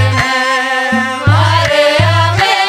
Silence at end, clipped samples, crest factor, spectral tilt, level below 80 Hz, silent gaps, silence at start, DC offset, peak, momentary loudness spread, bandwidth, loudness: 0 s; under 0.1%; 10 dB; -4.5 dB/octave; -36 dBFS; none; 0 s; under 0.1%; 0 dBFS; 3 LU; 13.5 kHz; -11 LUFS